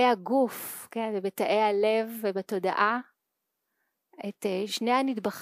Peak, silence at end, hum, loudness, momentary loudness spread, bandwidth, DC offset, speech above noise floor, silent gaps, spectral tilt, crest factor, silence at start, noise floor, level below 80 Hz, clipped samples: -10 dBFS; 0 s; none; -28 LUFS; 10 LU; 15.5 kHz; under 0.1%; 55 dB; none; -4.5 dB/octave; 18 dB; 0 s; -83 dBFS; -84 dBFS; under 0.1%